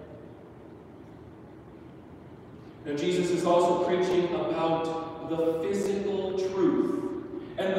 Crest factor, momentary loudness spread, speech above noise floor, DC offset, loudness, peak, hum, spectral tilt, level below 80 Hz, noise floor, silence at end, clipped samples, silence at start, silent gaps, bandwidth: 16 dB; 23 LU; 21 dB; under 0.1%; -28 LUFS; -12 dBFS; none; -6 dB/octave; -60 dBFS; -47 dBFS; 0 s; under 0.1%; 0 s; none; 12.5 kHz